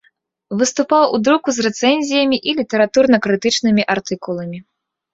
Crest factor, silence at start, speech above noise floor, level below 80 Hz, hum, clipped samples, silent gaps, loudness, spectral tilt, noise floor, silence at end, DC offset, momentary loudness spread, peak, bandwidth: 16 dB; 0.5 s; 44 dB; -58 dBFS; none; under 0.1%; none; -16 LUFS; -4 dB/octave; -60 dBFS; 0.5 s; under 0.1%; 11 LU; 0 dBFS; 8 kHz